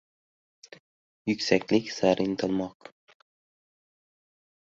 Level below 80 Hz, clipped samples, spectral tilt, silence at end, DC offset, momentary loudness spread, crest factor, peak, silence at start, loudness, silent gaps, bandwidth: -66 dBFS; under 0.1%; -5 dB/octave; 2 s; under 0.1%; 9 LU; 26 dB; -6 dBFS; 1.25 s; -27 LUFS; none; 7.8 kHz